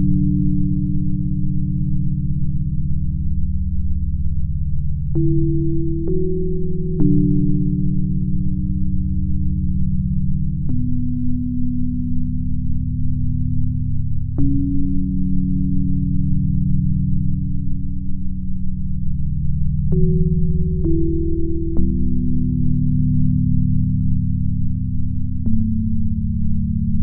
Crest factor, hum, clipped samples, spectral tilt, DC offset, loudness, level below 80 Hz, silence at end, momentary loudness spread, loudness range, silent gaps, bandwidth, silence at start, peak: 14 dB; none; under 0.1%; -18.5 dB/octave; under 0.1%; -21 LUFS; -22 dBFS; 0 s; 6 LU; 3 LU; none; 0.7 kHz; 0 s; -2 dBFS